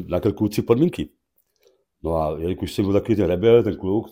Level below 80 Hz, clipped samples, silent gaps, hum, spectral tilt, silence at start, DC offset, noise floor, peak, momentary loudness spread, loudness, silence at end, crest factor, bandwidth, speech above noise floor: -44 dBFS; under 0.1%; none; none; -7.5 dB/octave; 0 s; under 0.1%; -66 dBFS; -2 dBFS; 10 LU; -21 LUFS; 0.05 s; 18 dB; 16.5 kHz; 46 dB